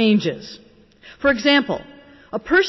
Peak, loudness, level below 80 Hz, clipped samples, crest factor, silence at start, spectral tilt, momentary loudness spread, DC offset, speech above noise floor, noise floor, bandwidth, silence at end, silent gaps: -6 dBFS; -19 LUFS; -50 dBFS; under 0.1%; 14 dB; 0 s; -5 dB/octave; 16 LU; under 0.1%; 29 dB; -47 dBFS; 6.2 kHz; 0 s; none